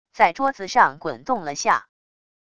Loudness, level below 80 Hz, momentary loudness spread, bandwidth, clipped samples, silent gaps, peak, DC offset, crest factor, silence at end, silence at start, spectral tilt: -21 LUFS; -62 dBFS; 8 LU; 11 kHz; under 0.1%; none; -2 dBFS; 0.4%; 22 dB; 0.75 s; 0.15 s; -3 dB/octave